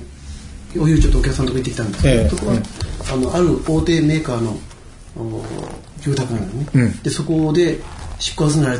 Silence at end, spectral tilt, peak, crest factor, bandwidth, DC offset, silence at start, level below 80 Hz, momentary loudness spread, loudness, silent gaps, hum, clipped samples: 0 s; -6 dB/octave; -2 dBFS; 16 dB; 11 kHz; under 0.1%; 0 s; -26 dBFS; 16 LU; -19 LUFS; none; none; under 0.1%